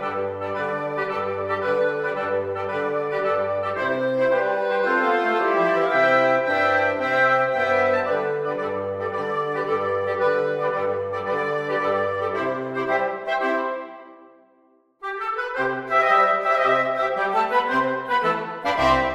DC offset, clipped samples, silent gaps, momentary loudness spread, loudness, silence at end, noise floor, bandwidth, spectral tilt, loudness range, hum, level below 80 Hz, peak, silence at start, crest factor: under 0.1%; under 0.1%; none; 8 LU; -22 LUFS; 0 s; -59 dBFS; 9.2 kHz; -5.5 dB/octave; 6 LU; none; -54 dBFS; -6 dBFS; 0 s; 18 dB